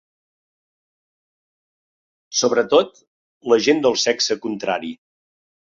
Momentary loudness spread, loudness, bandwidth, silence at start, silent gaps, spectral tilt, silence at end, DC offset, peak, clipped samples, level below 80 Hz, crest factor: 12 LU; -19 LUFS; 7.6 kHz; 2.3 s; 3.07-3.41 s; -2.5 dB/octave; 0.85 s; under 0.1%; -2 dBFS; under 0.1%; -66 dBFS; 20 dB